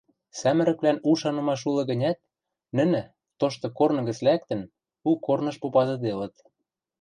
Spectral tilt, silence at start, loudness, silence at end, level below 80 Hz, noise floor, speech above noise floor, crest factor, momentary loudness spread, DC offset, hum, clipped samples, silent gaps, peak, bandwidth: -6.5 dB/octave; 0.35 s; -26 LUFS; 0.7 s; -68 dBFS; -83 dBFS; 59 dB; 16 dB; 10 LU; under 0.1%; none; under 0.1%; none; -8 dBFS; 9.8 kHz